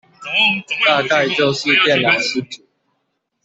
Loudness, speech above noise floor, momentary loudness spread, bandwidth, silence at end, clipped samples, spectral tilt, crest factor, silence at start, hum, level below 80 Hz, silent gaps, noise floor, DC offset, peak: -15 LUFS; 55 dB; 10 LU; 8.4 kHz; 0.9 s; under 0.1%; -3.5 dB/octave; 16 dB; 0.2 s; none; -62 dBFS; none; -71 dBFS; under 0.1%; -2 dBFS